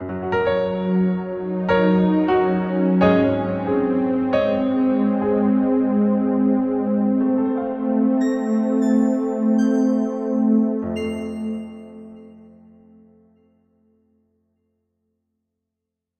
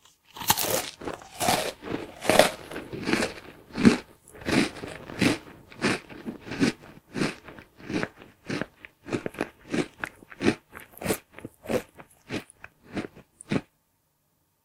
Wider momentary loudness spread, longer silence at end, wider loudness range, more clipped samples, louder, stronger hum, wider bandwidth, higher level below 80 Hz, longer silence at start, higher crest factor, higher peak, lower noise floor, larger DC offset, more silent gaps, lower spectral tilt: second, 8 LU vs 22 LU; first, 3.8 s vs 1 s; about the same, 7 LU vs 9 LU; neither; first, -20 LUFS vs -28 LUFS; neither; second, 8.4 kHz vs 18 kHz; about the same, -54 dBFS vs -56 dBFS; second, 0 s vs 0.35 s; second, 16 dB vs 30 dB; second, -4 dBFS vs 0 dBFS; first, -83 dBFS vs -71 dBFS; neither; neither; first, -8.5 dB/octave vs -4 dB/octave